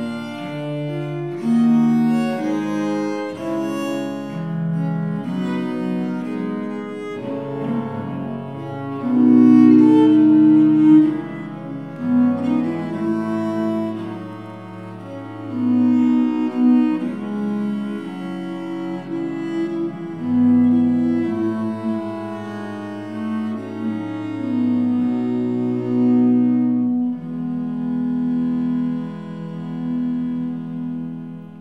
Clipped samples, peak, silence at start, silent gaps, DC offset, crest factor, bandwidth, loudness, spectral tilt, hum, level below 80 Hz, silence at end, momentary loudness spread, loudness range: under 0.1%; -2 dBFS; 0 s; none; 0.2%; 18 dB; 7.6 kHz; -20 LUFS; -8.5 dB/octave; none; -66 dBFS; 0 s; 16 LU; 11 LU